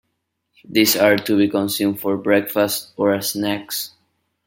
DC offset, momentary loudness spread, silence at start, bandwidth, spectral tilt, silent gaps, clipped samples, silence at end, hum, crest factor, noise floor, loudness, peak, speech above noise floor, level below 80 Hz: under 0.1%; 9 LU; 0.7 s; 17 kHz; -3.5 dB/octave; none; under 0.1%; 0.6 s; none; 18 dB; -74 dBFS; -19 LUFS; -2 dBFS; 55 dB; -64 dBFS